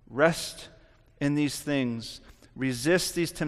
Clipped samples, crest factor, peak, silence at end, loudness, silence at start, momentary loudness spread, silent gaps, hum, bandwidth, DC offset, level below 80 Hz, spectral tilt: under 0.1%; 22 dB; -6 dBFS; 0 s; -28 LUFS; 0.1 s; 17 LU; none; none; 15 kHz; under 0.1%; -54 dBFS; -4.5 dB/octave